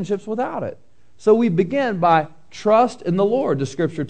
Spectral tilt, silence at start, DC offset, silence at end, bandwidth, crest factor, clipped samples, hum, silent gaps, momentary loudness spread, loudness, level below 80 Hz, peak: -7 dB/octave; 0 s; 0.8%; 0 s; 9.2 kHz; 16 dB; under 0.1%; none; none; 9 LU; -19 LUFS; -58 dBFS; -2 dBFS